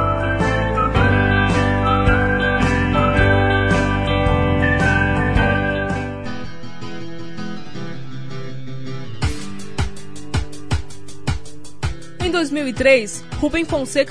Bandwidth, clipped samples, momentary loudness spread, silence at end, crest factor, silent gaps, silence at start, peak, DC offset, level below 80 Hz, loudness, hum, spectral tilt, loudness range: 11 kHz; under 0.1%; 16 LU; 0 s; 16 dB; none; 0 s; -2 dBFS; under 0.1%; -28 dBFS; -18 LUFS; none; -6 dB/octave; 13 LU